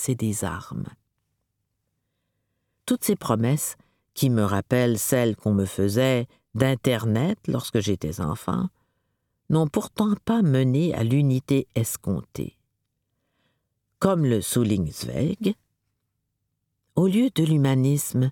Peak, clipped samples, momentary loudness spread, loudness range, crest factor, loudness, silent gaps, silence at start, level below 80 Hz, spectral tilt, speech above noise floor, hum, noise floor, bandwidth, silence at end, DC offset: -4 dBFS; under 0.1%; 10 LU; 4 LU; 20 dB; -24 LUFS; none; 0 s; -54 dBFS; -6 dB/octave; 55 dB; none; -78 dBFS; 18.5 kHz; 0 s; under 0.1%